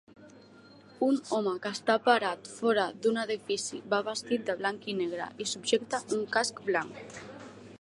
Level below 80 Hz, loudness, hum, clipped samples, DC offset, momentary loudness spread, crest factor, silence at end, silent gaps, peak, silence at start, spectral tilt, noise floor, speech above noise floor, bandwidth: -76 dBFS; -30 LUFS; none; under 0.1%; under 0.1%; 9 LU; 22 dB; 0.05 s; none; -10 dBFS; 0.2 s; -3 dB/octave; -54 dBFS; 24 dB; 11.5 kHz